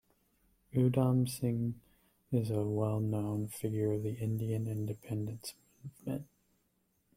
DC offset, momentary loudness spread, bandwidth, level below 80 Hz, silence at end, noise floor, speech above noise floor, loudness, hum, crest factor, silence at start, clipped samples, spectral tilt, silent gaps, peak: under 0.1%; 13 LU; 16 kHz; -66 dBFS; 0.9 s; -76 dBFS; 43 dB; -35 LUFS; none; 18 dB; 0.75 s; under 0.1%; -8 dB/octave; none; -16 dBFS